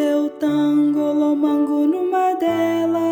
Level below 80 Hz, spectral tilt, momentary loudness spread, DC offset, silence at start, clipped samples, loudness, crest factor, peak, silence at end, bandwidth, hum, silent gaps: -66 dBFS; -6.5 dB/octave; 2 LU; under 0.1%; 0 s; under 0.1%; -18 LUFS; 10 dB; -8 dBFS; 0 s; 16 kHz; none; none